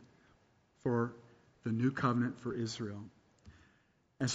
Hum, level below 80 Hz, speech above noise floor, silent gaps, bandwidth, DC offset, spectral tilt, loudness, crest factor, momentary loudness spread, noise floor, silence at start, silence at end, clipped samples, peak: none; -70 dBFS; 37 dB; none; 7.6 kHz; under 0.1%; -6 dB/octave; -36 LUFS; 22 dB; 12 LU; -72 dBFS; 0.85 s; 0 s; under 0.1%; -16 dBFS